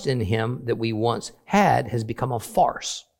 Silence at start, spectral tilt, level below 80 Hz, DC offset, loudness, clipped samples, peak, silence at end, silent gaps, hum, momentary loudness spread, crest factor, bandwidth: 0 s; -5.5 dB/octave; -52 dBFS; under 0.1%; -24 LUFS; under 0.1%; -4 dBFS; 0.2 s; none; none; 8 LU; 18 dB; 17 kHz